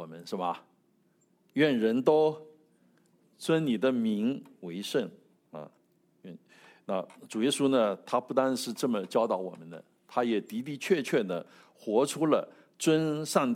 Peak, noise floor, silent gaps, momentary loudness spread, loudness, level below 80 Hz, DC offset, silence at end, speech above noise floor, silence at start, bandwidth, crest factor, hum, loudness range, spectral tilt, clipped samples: -10 dBFS; -69 dBFS; none; 21 LU; -29 LUFS; -84 dBFS; under 0.1%; 0 s; 40 dB; 0 s; 16.5 kHz; 20 dB; none; 5 LU; -5 dB/octave; under 0.1%